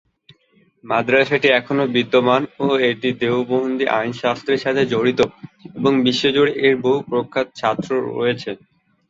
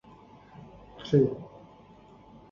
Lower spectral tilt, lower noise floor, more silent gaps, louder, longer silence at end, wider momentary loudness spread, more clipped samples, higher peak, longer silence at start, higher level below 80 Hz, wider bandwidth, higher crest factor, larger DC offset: second, -5.5 dB/octave vs -9 dB/octave; first, -58 dBFS vs -54 dBFS; neither; first, -18 LUFS vs -26 LUFS; second, 0.55 s vs 1.05 s; second, 6 LU vs 26 LU; neither; first, -2 dBFS vs -10 dBFS; first, 0.85 s vs 0.6 s; about the same, -60 dBFS vs -60 dBFS; first, 7.8 kHz vs 7 kHz; about the same, 18 dB vs 22 dB; neither